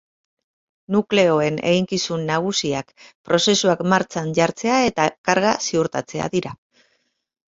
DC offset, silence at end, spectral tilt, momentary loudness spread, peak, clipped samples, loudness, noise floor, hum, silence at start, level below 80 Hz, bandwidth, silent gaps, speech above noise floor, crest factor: under 0.1%; 0.9 s; -4 dB/octave; 8 LU; -2 dBFS; under 0.1%; -20 LUFS; -67 dBFS; none; 0.9 s; -58 dBFS; 8 kHz; 3.15-3.24 s, 5.18-5.24 s; 47 dB; 20 dB